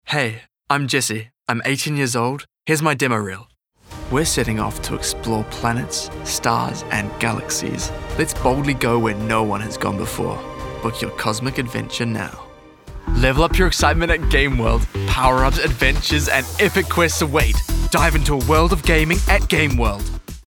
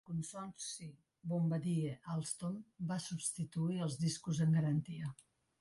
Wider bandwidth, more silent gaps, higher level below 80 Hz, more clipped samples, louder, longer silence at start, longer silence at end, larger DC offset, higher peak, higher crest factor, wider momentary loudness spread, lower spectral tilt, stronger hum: first, 19 kHz vs 11.5 kHz; neither; first, -26 dBFS vs -72 dBFS; neither; first, -19 LUFS vs -39 LUFS; about the same, 0.05 s vs 0.1 s; second, 0.05 s vs 0.45 s; neither; first, -2 dBFS vs -26 dBFS; about the same, 18 dB vs 14 dB; second, 9 LU vs 12 LU; second, -4.5 dB/octave vs -6 dB/octave; neither